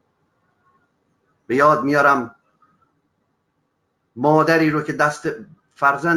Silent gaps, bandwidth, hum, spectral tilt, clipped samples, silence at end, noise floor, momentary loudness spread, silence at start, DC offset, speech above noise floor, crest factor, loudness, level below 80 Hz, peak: none; 18 kHz; none; -6 dB/octave; under 0.1%; 0 s; -70 dBFS; 13 LU; 1.5 s; under 0.1%; 53 dB; 20 dB; -18 LUFS; -64 dBFS; -2 dBFS